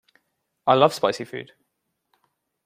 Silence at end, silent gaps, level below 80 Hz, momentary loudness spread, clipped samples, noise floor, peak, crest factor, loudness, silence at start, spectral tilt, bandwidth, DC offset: 1.2 s; none; -68 dBFS; 17 LU; under 0.1%; -77 dBFS; -2 dBFS; 24 dB; -21 LUFS; 0.65 s; -5 dB/octave; 16 kHz; under 0.1%